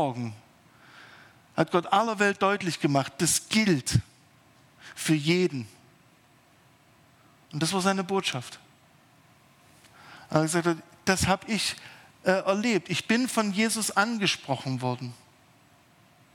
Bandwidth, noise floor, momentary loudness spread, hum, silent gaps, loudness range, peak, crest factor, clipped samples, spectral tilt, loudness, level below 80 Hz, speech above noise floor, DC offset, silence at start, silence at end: 18 kHz; -60 dBFS; 13 LU; none; none; 6 LU; -6 dBFS; 24 dB; under 0.1%; -4 dB/octave; -26 LUFS; -60 dBFS; 33 dB; under 0.1%; 0 s; 1.2 s